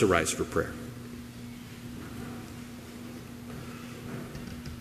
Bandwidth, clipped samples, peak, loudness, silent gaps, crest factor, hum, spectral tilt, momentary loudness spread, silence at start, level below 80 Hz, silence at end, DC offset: 15.5 kHz; under 0.1%; -8 dBFS; -36 LUFS; none; 26 dB; none; -4.5 dB/octave; 14 LU; 0 s; -52 dBFS; 0 s; under 0.1%